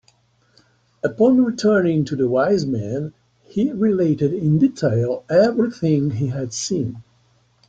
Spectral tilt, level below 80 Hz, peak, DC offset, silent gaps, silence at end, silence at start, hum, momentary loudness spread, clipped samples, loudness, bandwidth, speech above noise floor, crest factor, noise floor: -7 dB/octave; -56 dBFS; -4 dBFS; under 0.1%; none; 0.65 s; 1.05 s; none; 11 LU; under 0.1%; -19 LUFS; 9 kHz; 41 dB; 16 dB; -59 dBFS